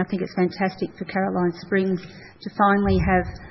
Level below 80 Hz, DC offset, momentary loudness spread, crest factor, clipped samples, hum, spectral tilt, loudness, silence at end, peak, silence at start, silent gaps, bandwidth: -40 dBFS; under 0.1%; 11 LU; 18 dB; under 0.1%; none; -9 dB/octave; -23 LUFS; 0 s; -6 dBFS; 0 s; none; 6 kHz